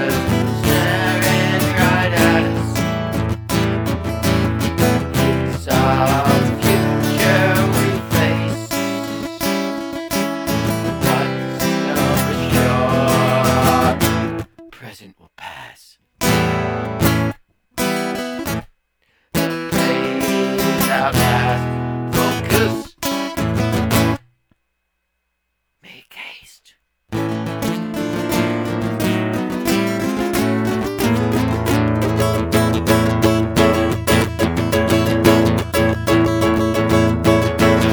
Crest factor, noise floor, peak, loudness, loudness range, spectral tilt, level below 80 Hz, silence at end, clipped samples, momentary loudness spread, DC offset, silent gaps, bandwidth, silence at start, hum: 18 dB; -72 dBFS; 0 dBFS; -17 LUFS; 6 LU; -5.5 dB/octave; -36 dBFS; 0 s; under 0.1%; 8 LU; under 0.1%; none; over 20 kHz; 0 s; none